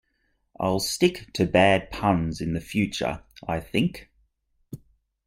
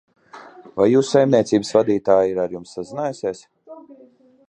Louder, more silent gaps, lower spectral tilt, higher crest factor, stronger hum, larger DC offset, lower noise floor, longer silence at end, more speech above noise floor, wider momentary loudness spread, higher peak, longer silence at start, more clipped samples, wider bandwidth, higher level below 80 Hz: second, -25 LUFS vs -19 LUFS; neither; about the same, -5 dB/octave vs -6 dB/octave; about the same, 22 dB vs 18 dB; neither; neither; first, -71 dBFS vs -51 dBFS; about the same, 0.5 s vs 0.55 s; first, 47 dB vs 32 dB; first, 25 LU vs 15 LU; about the same, -4 dBFS vs -2 dBFS; first, 0.6 s vs 0.35 s; neither; first, 16.5 kHz vs 10 kHz; first, -48 dBFS vs -60 dBFS